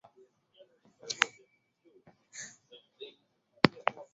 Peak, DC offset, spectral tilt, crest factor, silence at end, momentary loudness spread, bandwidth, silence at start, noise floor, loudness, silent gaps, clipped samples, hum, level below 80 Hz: 0 dBFS; under 0.1%; -2.5 dB/octave; 36 dB; 0.1 s; 22 LU; 8 kHz; 1.05 s; -70 dBFS; -32 LUFS; none; under 0.1%; none; -70 dBFS